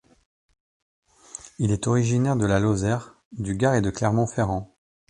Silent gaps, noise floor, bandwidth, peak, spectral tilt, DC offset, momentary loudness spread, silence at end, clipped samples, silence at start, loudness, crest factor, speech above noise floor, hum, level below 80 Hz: 3.25-3.31 s; -45 dBFS; 10.5 kHz; -6 dBFS; -6.5 dB/octave; under 0.1%; 15 LU; 0.45 s; under 0.1%; 1.35 s; -24 LUFS; 18 dB; 22 dB; none; -46 dBFS